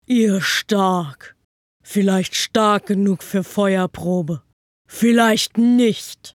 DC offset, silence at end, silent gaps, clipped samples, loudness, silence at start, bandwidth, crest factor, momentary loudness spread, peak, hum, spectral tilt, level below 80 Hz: under 0.1%; 0.05 s; 1.44-1.80 s, 4.53-4.85 s; under 0.1%; -18 LUFS; 0.1 s; 17 kHz; 18 dB; 10 LU; 0 dBFS; none; -5 dB/octave; -60 dBFS